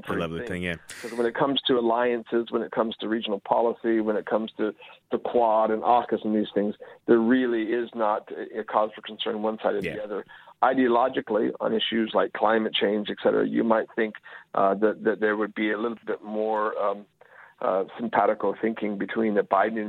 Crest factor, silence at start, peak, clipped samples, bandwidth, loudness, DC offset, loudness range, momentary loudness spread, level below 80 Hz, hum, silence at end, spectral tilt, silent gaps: 20 dB; 0.05 s; -6 dBFS; under 0.1%; 11 kHz; -26 LUFS; under 0.1%; 3 LU; 9 LU; -64 dBFS; none; 0 s; -6 dB/octave; none